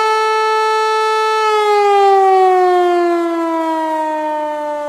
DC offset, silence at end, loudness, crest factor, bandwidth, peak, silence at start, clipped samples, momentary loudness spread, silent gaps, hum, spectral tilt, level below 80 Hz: under 0.1%; 0 s; -13 LUFS; 10 dB; 14.5 kHz; -2 dBFS; 0 s; under 0.1%; 8 LU; none; none; -2 dB/octave; -64 dBFS